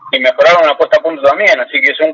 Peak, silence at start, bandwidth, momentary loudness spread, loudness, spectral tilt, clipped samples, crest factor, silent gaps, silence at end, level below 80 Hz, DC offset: 0 dBFS; 0.05 s; 7.4 kHz; 4 LU; -9 LUFS; -3 dB/octave; under 0.1%; 10 dB; none; 0 s; -58 dBFS; under 0.1%